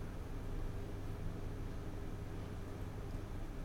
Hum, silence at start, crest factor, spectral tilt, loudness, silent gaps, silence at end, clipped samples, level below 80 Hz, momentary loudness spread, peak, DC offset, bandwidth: none; 0 s; 14 dB; -7 dB/octave; -47 LUFS; none; 0 s; under 0.1%; -46 dBFS; 1 LU; -28 dBFS; under 0.1%; 16.5 kHz